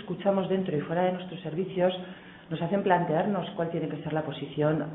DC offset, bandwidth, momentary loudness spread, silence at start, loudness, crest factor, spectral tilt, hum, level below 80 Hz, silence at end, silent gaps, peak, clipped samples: under 0.1%; 4 kHz; 10 LU; 0 s; -29 LUFS; 18 dB; -11 dB/octave; none; -66 dBFS; 0 s; none; -10 dBFS; under 0.1%